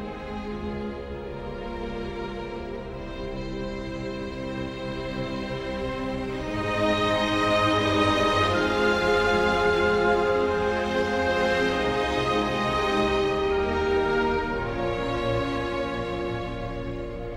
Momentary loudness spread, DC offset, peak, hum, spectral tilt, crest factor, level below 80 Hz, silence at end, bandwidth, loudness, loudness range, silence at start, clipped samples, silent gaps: 12 LU; under 0.1%; -10 dBFS; none; -5.5 dB/octave; 16 dB; -40 dBFS; 0 s; 13.5 kHz; -26 LUFS; 11 LU; 0 s; under 0.1%; none